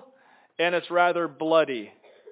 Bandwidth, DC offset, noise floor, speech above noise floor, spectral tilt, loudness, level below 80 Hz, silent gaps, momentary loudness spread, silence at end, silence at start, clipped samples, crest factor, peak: 4 kHz; under 0.1%; -58 dBFS; 34 dB; -8.5 dB/octave; -24 LUFS; -90 dBFS; none; 16 LU; 0.4 s; 0.6 s; under 0.1%; 18 dB; -8 dBFS